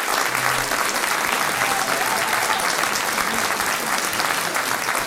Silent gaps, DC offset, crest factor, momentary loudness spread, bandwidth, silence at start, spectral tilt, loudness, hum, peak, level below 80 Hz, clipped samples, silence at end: none; under 0.1%; 20 dB; 2 LU; 16.5 kHz; 0 s; -1 dB/octave; -20 LUFS; none; -2 dBFS; -52 dBFS; under 0.1%; 0 s